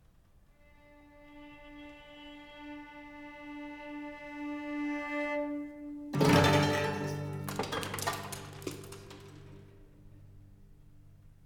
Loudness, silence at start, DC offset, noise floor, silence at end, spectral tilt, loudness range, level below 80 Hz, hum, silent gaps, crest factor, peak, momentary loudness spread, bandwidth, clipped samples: -33 LUFS; 0.85 s; under 0.1%; -62 dBFS; 0 s; -5 dB/octave; 18 LU; -58 dBFS; none; none; 26 dB; -10 dBFS; 24 LU; 19 kHz; under 0.1%